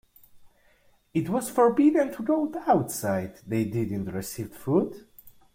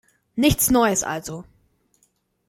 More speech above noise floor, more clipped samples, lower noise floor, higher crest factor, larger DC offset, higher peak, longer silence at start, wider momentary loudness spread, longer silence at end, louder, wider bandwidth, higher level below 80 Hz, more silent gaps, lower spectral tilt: second, 36 dB vs 47 dB; neither; second, -62 dBFS vs -67 dBFS; about the same, 18 dB vs 18 dB; neither; about the same, -8 dBFS vs -6 dBFS; about the same, 0.35 s vs 0.35 s; second, 12 LU vs 18 LU; second, 0.25 s vs 1.05 s; second, -26 LUFS vs -20 LUFS; about the same, 16.5 kHz vs 16.5 kHz; second, -60 dBFS vs -42 dBFS; neither; first, -6.5 dB/octave vs -3.5 dB/octave